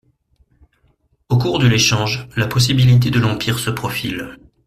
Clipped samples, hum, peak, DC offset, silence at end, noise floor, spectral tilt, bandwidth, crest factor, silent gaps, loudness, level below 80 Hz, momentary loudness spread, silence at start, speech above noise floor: under 0.1%; none; -2 dBFS; under 0.1%; 0.3 s; -60 dBFS; -5 dB/octave; 15 kHz; 16 dB; none; -16 LUFS; -44 dBFS; 10 LU; 1.3 s; 44 dB